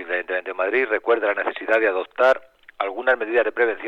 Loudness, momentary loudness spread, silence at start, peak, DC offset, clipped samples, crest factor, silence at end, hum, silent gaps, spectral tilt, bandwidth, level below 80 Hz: -21 LUFS; 6 LU; 0 s; -6 dBFS; under 0.1%; under 0.1%; 16 dB; 0 s; none; none; -4 dB/octave; 7.6 kHz; -66 dBFS